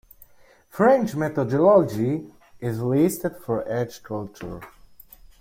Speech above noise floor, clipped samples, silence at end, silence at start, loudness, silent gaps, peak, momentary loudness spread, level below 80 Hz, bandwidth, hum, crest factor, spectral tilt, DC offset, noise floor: 32 dB; under 0.1%; 0.7 s; 0.75 s; -22 LUFS; none; -6 dBFS; 18 LU; -56 dBFS; 16.5 kHz; none; 18 dB; -7.5 dB/octave; under 0.1%; -54 dBFS